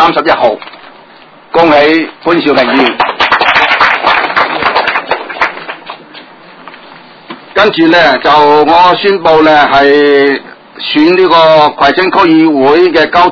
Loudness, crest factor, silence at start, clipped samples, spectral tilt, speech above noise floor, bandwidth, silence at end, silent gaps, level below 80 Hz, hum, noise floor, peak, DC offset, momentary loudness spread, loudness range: -7 LUFS; 8 dB; 0 s; 3%; -5.5 dB/octave; 30 dB; 6 kHz; 0 s; none; -44 dBFS; none; -36 dBFS; 0 dBFS; under 0.1%; 9 LU; 7 LU